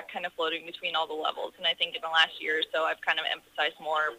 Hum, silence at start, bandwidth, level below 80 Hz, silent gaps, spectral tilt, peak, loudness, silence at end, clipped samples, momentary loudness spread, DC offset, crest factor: none; 0 s; 15.5 kHz; -76 dBFS; none; -1.5 dB/octave; -10 dBFS; -29 LUFS; 0 s; under 0.1%; 8 LU; under 0.1%; 20 dB